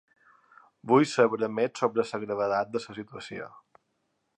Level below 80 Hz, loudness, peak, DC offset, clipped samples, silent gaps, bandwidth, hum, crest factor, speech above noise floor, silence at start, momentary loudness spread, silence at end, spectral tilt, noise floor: -74 dBFS; -27 LUFS; -8 dBFS; under 0.1%; under 0.1%; none; 10 kHz; none; 22 dB; 49 dB; 0.85 s; 17 LU; 0.8 s; -5.5 dB/octave; -76 dBFS